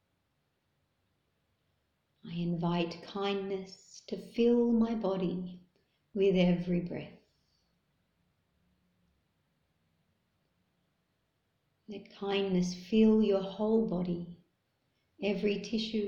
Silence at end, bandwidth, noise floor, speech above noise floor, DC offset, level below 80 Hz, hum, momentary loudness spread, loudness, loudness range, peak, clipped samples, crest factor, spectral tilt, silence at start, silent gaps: 0 s; 7.4 kHz; -79 dBFS; 48 dB; under 0.1%; -62 dBFS; none; 17 LU; -31 LUFS; 8 LU; -16 dBFS; under 0.1%; 18 dB; -7 dB/octave; 2.25 s; none